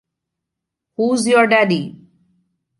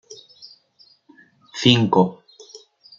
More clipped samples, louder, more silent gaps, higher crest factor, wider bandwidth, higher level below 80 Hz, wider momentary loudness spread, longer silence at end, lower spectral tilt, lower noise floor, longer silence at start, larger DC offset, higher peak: neither; first, -15 LUFS vs -18 LUFS; neither; about the same, 18 dB vs 22 dB; first, 11.5 kHz vs 7.6 kHz; second, -68 dBFS vs -60 dBFS; second, 18 LU vs 21 LU; first, 0.9 s vs 0.4 s; about the same, -4.5 dB/octave vs -5.5 dB/octave; first, -81 dBFS vs -56 dBFS; first, 1 s vs 0.1 s; neither; about the same, -2 dBFS vs 0 dBFS